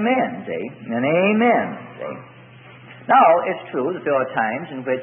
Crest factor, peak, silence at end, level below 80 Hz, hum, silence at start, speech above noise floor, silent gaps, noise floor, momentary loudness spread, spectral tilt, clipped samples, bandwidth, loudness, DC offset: 18 dB; -2 dBFS; 0 s; -70 dBFS; none; 0 s; 24 dB; none; -43 dBFS; 18 LU; -11 dB/octave; under 0.1%; 3.6 kHz; -19 LUFS; under 0.1%